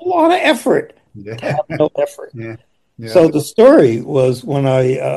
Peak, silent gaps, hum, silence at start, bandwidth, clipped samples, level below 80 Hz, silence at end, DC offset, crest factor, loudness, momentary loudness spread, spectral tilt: 0 dBFS; none; none; 0 s; 12.5 kHz; 0.3%; -56 dBFS; 0 s; under 0.1%; 14 dB; -13 LUFS; 21 LU; -6.5 dB/octave